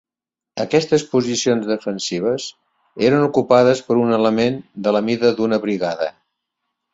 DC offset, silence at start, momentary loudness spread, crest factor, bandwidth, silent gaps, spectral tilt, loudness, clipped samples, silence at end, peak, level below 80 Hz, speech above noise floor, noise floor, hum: under 0.1%; 0.55 s; 9 LU; 18 dB; 8 kHz; none; -5 dB/octave; -18 LUFS; under 0.1%; 0.85 s; -2 dBFS; -60 dBFS; 71 dB; -88 dBFS; none